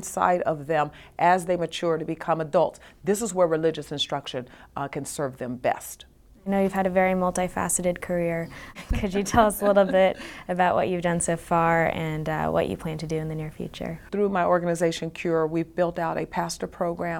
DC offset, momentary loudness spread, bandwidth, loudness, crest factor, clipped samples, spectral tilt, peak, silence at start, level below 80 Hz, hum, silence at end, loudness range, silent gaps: under 0.1%; 12 LU; 17.5 kHz; -25 LUFS; 20 dB; under 0.1%; -5 dB/octave; -6 dBFS; 0 s; -44 dBFS; none; 0 s; 5 LU; none